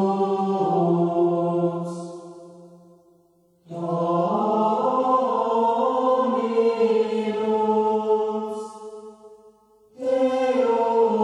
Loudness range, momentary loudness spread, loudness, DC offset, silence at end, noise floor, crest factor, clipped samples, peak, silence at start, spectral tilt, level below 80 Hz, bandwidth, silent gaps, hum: 6 LU; 13 LU; -22 LUFS; under 0.1%; 0 s; -60 dBFS; 14 dB; under 0.1%; -8 dBFS; 0 s; -8 dB/octave; -76 dBFS; 10.5 kHz; none; none